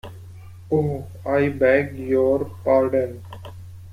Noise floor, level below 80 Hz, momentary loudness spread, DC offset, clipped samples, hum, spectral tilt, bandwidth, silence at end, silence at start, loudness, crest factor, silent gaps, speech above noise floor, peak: -40 dBFS; -52 dBFS; 21 LU; under 0.1%; under 0.1%; none; -8.5 dB/octave; 14.5 kHz; 0 s; 0.05 s; -21 LUFS; 18 dB; none; 20 dB; -4 dBFS